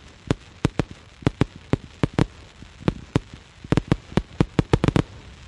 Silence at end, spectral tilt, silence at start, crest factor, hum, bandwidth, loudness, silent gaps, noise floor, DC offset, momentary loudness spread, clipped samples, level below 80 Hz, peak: 0.15 s; -7 dB/octave; 0.3 s; 22 dB; none; 11.5 kHz; -25 LUFS; none; -45 dBFS; under 0.1%; 14 LU; under 0.1%; -38 dBFS; -2 dBFS